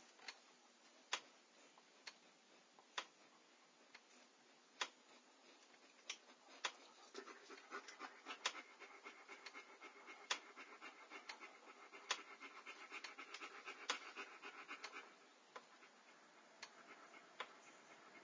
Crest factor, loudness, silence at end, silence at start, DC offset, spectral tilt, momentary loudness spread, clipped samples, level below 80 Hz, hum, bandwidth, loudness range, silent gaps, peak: 30 dB; -53 LUFS; 0 s; 0 s; under 0.1%; 1 dB/octave; 20 LU; under 0.1%; under -90 dBFS; none; 8 kHz; 7 LU; none; -26 dBFS